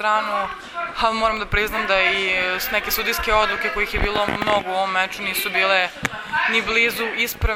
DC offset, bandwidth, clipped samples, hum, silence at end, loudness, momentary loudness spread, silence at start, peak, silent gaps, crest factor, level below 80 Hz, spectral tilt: under 0.1%; 19 kHz; under 0.1%; none; 0 s; -20 LUFS; 6 LU; 0 s; -2 dBFS; none; 20 dB; -36 dBFS; -3 dB/octave